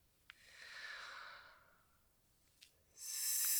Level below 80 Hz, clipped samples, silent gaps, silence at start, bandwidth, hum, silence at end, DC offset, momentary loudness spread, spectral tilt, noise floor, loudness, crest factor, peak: -82 dBFS; under 0.1%; none; 0.4 s; over 20 kHz; none; 0 s; under 0.1%; 27 LU; 3.5 dB/octave; -75 dBFS; -44 LUFS; 22 dB; -24 dBFS